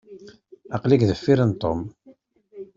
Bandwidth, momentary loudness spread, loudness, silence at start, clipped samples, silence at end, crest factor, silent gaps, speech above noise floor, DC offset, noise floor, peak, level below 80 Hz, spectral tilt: 7.4 kHz; 16 LU; -21 LUFS; 0.1 s; under 0.1%; 0.15 s; 20 dB; none; 34 dB; under 0.1%; -54 dBFS; -4 dBFS; -52 dBFS; -8 dB/octave